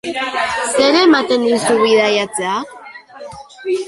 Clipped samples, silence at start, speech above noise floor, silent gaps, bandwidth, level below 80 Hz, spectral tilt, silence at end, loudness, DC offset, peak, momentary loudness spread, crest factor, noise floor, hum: under 0.1%; 0.05 s; 21 dB; none; 11.5 kHz; -56 dBFS; -3 dB/octave; 0 s; -14 LUFS; under 0.1%; -2 dBFS; 22 LU; 14 dB; -35 dBFS; none